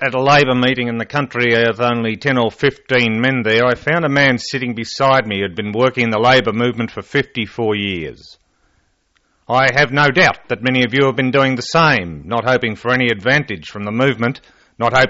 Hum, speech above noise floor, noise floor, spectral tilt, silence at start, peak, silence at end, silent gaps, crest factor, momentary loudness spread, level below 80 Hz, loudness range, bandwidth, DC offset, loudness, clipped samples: none; 46 dB; -62 dBFS; -3.5 dB/octave; 0 s; -2 dBFS; 0 s; none; 14 dB; 9 LU; -48 dBFS; 4 LU; 8 kHz; under 0.1%; -15 LUFS; under 0.1%